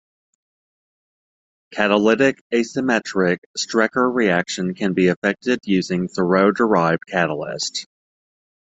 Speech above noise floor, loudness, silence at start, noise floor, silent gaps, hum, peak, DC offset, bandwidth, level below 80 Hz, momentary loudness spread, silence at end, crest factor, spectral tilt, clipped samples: over 71 dB; -19 LUFS; 1.7 s; under -90 dBFS; 2.41-2.50 s, 3.38-3.54 s, 5.16-5.22 s; none; -2 dBFS; under 0.1%; 8.2 kHz; -60 dBFS; 8 LU; 0.95 s; 20 dB; -5 dB/octave; under 0.1%